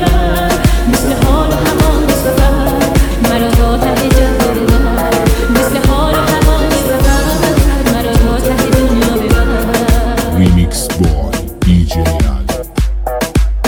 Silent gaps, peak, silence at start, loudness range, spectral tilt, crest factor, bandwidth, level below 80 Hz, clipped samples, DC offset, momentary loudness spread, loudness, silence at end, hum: none; 0 dBFS; 0 s; 1 LU; -5.5 dB/octave; 10 dB; 20 kHz; -14 dBFS; under 0.1%; 0.2%; 4 LU; -12 LUFS; 0 s; none